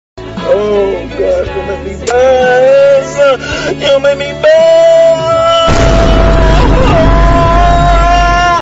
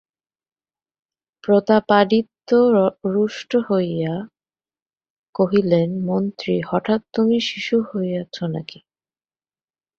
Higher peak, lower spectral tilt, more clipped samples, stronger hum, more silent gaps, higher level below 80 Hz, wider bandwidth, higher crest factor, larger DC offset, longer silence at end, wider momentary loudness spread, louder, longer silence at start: about the same, 0 dBFS vs -2 dBFS; second, -5.5 dB/octave vs -7 dB/octave; neither; neither; second, none vs 4.82-4.86 s, 5.10-5.33 s; first, -14 dBFS vs -62 dBFS; first, 8 kHz vs 7 kHz; second, 8 dB vs 18 dB; neither; second, 0 s vs 1.35 s; about the same, 9 LU vs 11 LU; first, -8 LUFS vs -19 LUFS; second, 0.15 s vs 1.45 s